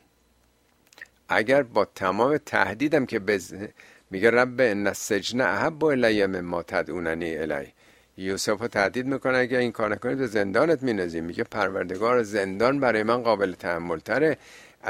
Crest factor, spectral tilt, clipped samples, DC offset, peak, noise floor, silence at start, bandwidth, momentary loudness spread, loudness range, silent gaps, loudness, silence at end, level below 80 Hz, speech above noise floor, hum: 22 dB; -5 dB/octave; under 0.1%; under 0.1%; -4 dBFS; -64 dBFS; 1 s; 16 kHz; 9 LU; 3 LU; none; -25 LUFS; 0 s; -60 dBFS; 39 dB; none